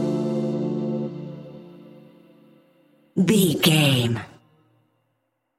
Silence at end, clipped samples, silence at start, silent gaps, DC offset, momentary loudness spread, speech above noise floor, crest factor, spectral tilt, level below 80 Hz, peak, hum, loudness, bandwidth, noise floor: 1.3 s; under 0.1%; 0 s; none; under 0.1%; 22 LU; 55 dB; 20 dB; -5 dB/octave; -62 dBFS; -4 dBFS; none; -22 LUFS; 16.5 kHz; -74 dBFS